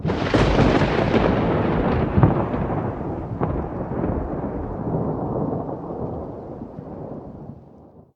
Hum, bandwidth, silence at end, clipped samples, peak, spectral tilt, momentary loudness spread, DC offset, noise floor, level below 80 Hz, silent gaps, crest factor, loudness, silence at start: none; 9 kHz; 0.15 s; under 0.1%; 0 dBFS; -8 dB/octave; 17 LU; under 0.1%; -47 dBFS; -34 dBFS; none; 22 dB; -22 LUFS; 0 s